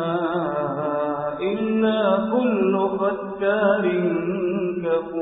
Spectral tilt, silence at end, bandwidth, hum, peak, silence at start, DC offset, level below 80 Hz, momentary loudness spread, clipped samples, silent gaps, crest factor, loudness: -11.5 dB/octave; 0 s; 4 kHz; none; -6 dBFS; 0 s; under 0.1%; -58 dBFS; 5 LU; under 0.1%; none; 16 dB; -22 LUFS